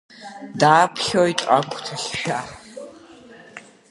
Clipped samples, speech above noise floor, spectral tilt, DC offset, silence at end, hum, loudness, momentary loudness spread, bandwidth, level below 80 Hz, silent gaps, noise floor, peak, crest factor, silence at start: under 0.1%; 25 dB; -4 dB/octave; under 0.1%; 0.3 s; none; -19 LUFS; 25 LU; 11.5 kHz; -60 dBFS; none; -45 dBFS; -2 dBFS; 20 dB; 0.2 s